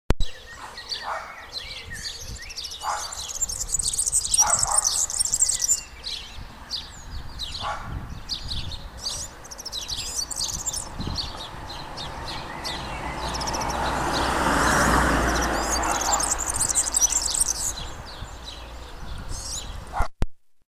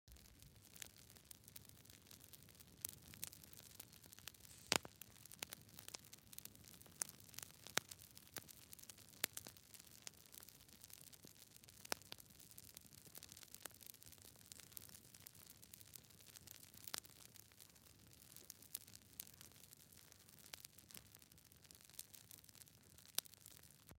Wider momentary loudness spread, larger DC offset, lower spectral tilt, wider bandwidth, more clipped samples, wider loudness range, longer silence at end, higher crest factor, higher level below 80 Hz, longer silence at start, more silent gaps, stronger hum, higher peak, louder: about the same, 17 LU vs 16 LU; neither; about the same, -1.5 dB/octave vs -1 dB/octave; about the same, 15.5 kHz vs 17 kHz; neither; about the same, 11 LU vs 9 LU; first, 0.4 s vs 0 s; second, 24 dB vs 46 dB; first, -36 dBFS vs -78 dBFS; about the same, 0.1 s vs 0.05 s; neither; neither; first, -2 dBFS vs -10 dBFS; first, -24 LUFS vs -53 LUFS